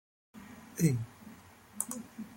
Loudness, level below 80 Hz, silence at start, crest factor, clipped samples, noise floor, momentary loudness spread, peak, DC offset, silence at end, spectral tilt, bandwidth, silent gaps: -35 LUFS; -68 dBFS; 0.35 s; 24 dB; under 0.1%; -54 dBFS; 23 LU; -14 dBFS; under 0.1%; 0 s; -6 dB/octave; 16.5 kHz; none